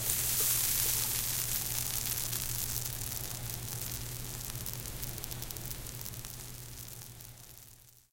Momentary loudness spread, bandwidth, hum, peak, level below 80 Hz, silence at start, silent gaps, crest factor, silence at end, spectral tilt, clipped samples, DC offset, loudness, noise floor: 18 LU; 17 kHz; none; -8 dBFS; -50 dBFS; 0 s; none; 28 dB; 0.15 s; -1.5 dB/octave; under 0.1%; under 0.1%; -33 LUFS; -57 dBFS